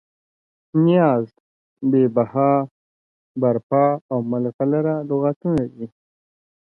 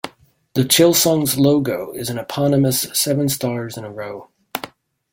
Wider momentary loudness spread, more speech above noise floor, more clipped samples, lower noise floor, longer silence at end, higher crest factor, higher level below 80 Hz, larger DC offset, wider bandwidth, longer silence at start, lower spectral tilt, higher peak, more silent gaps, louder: second, 13 LU vs 18 LU; first, over 71 dB vs 27 dB; neither; first, under -90 dBFS vs -45 dBFS; first, 0.8 s vs 0.45 s; about the same, 16 dB vs 18 dB; about the same, -60 dBFS vs -56 dBFS; neither; second, 4.3 kHz vs 17 kHz; first, 0.75 s vs 0.05 s; first, -10.5 dB/octave vs -4.5 dB/octave; second, -4 dBFS vs 0 dBFS; first, 1.40-1.76 s, 2.71-3.35 s, 3.63-3.70 s, 4.01-4.09 s, 4.54-4.59 s, 5.36-5.41 s vs none; second, -20 LUFS vs -17 LUFS